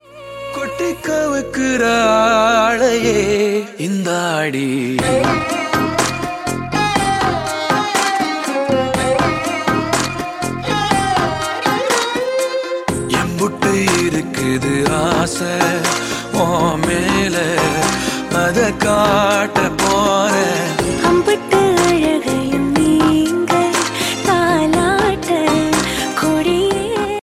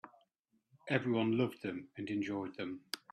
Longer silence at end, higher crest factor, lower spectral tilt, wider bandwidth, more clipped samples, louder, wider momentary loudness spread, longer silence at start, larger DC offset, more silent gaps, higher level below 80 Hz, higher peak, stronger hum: second, 0 s vs 0.15 s; second, 16 dB vs 22 dB; second, -4 dB/octave vs -6 dB/octave; first, 16.5 kHz vs 13 kHz; neither; first, -16 LUFS vs -37 LUFS; second, 6 LU vs 11 LU; about the same, 0.1 s vs 0.05 s; neither; neither; first, -40 dBFS vs -78 dBFS; first, 0 dBFS vs -16 dBFS; neither